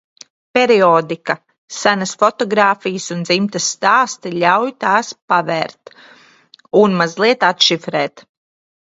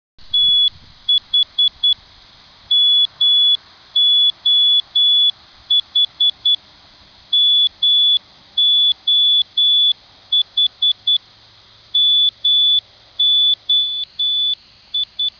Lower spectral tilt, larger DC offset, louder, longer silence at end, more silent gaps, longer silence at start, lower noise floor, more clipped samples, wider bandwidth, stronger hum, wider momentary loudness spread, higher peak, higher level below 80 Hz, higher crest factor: first, -3.5 dB/octave vs 0 dB/octave; neither; about the same, -15 LUFS vs -13 LUFS; first, 0.6 s vs 0.1 s; first, 1.58-1.68 s, 5.22-5.28 s vs none; first, 0.55 s vs 0.25 s; about the same, -48 dBFS vs -47 dBFS; neither; first, 8 kHz vs 5.4 kHz; neither; about the same, 10 LU vs 8 LU; first, 0 dBFS vs -8 dBFS; second, -64 dBFS vs -58 dBFS; first, 16 dB vs 8 dB